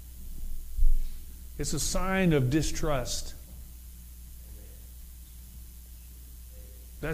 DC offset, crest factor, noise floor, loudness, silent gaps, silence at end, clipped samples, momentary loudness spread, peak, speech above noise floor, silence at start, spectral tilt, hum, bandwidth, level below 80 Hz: under 0.1%; 20 dB; -46 dBFS; -30 LUFS; none; 0 s; under 0.1%; 22 LU; -10 dBFS; 19 dB; 0 s; -4.5 dB/octave; none; 16 kHz; -32 dBFS